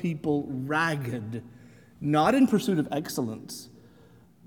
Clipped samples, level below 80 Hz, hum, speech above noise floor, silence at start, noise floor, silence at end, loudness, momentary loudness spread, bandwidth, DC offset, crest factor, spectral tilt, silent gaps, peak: under 0.1%; -62 dBFS; none; 29 dB; 0 s; -56 dBFS; 0.75 s; -27 LUFS; 17 LU; 18.5 kHz; under 0.1%; 18 dB; -6 dB/octave; none; -10 dBFS